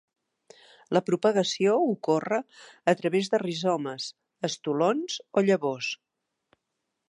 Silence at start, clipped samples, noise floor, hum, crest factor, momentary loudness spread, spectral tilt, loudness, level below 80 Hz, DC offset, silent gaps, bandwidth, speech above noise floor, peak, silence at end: 0.9 s; under 0.1%; -82 dBFS; none; 20 dB; 10 LU; -5 dB/octave; -27 LUFS; -80 dBFS; under 0.1%; none; 11.5 kHz; 56 dB; -8 dBFS; 1.15 s